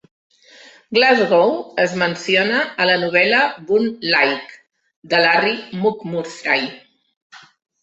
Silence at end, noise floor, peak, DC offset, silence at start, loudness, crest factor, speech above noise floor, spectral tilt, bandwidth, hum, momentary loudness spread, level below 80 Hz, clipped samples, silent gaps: 0.45 s; -46 dBFS; -2 dBFS; under 0.1%; 0.9 s; -17 LUFS; 18 dB; 29 dB; -4.5 dB/octave; 8.2 kHz; none; 8 LU; -66 dBFS; under 0.1%; 4.96-5.02 s, 7.17-7.30 s